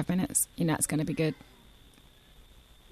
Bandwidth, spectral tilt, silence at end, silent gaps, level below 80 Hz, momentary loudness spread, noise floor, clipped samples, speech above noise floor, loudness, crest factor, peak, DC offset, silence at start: 14 kHz; -4.5 dB/octave; 0.5 s; none; -56 dBFS; 5 LU; -57 dBFS; under 0.1%; 28 dB; -29 LUFS; 22 dB; -10 dBFS; under 0.1%; 0 s